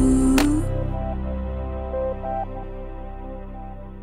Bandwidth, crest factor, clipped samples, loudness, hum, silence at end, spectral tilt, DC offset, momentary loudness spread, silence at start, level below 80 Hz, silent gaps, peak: 16 kHz; 18 dB; under 0.1%; -24 LUFS; none; 0 s; -6.5 dB/octave; under 0.1%; 18 LU; 0 s; -30 dBFS; none; -6 dBFS